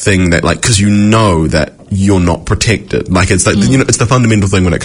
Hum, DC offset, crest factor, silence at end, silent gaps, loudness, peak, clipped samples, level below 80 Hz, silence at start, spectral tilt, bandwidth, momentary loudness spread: none; under 0.1%; 10 dB; 0 s; none; -10 LUFS; 0 dBFS; 0.3%; -28 dBFS; 0 s; -5 dB/octave; 11 kHz; 5 LU